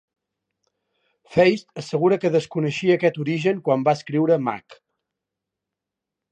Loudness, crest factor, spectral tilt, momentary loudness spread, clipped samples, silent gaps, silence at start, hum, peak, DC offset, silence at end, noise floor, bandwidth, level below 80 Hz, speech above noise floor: -21 LUFS; 18 dB; -7 dB/octave; 8 LU; under 0.1%; none; 1.3 s; none; -4 dBFS; under 0.1%; 1.55 s; -85 dBFS; 9.2 kHz; -64 dBFS; 65 dB